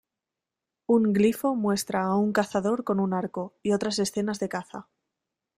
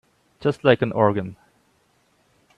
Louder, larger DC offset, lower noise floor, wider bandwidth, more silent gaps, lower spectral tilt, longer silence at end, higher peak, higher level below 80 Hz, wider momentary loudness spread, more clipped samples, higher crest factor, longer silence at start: second, -26 LUFS vs -21 LUFS; neither; first, -88 dBFS vs -63 dBFS; first, 15.5 kHz vs 10.5 kHz; neither; second, -5.5 dB/octave vs -8 dB/octave; second, 0.75 s vs 1.25 s; second, -10 dBFS vs -2 dBFS; about the same, -64 dBFS vs -60 dBFS; about the same, 11 LU vs 10 LU; neither; about the same, 18 dB vs 22 dB; first, 0.9 s vs 0.4 s